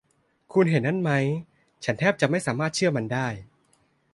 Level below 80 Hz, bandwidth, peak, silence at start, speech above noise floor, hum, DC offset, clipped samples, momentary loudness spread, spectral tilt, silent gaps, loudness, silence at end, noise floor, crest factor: -62 dBFS; 11.5 kHz; -6 dBFS; 0.5 s; 42 dB; none; under 0.1%; under 0.1%; 10 LU; -6 dB/octave; none; -25 LUFS; 0.7 s; -66 dBFS; 18 dB